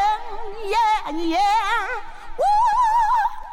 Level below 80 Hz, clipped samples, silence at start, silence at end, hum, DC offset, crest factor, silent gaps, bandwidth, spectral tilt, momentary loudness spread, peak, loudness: -38 dBFS; under 0.1%; 0 s; 0 s; none; under 0.1%; 10 dB; none; 16 kHz; -3 dB/octave; 14 LU; -10 dBFS; -20 LUFS